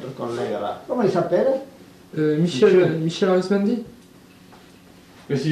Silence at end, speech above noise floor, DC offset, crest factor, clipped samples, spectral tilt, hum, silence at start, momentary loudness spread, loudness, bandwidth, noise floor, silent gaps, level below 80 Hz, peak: 0 s; 28 dB; under 0.1%; 16 dB; under 0.1%; -7 dB/octave; none; 0 s; 12 LU; -21 LUFS; 13.5 kHz; -48 dBFS; none; -62 dBFS; -4 dBFS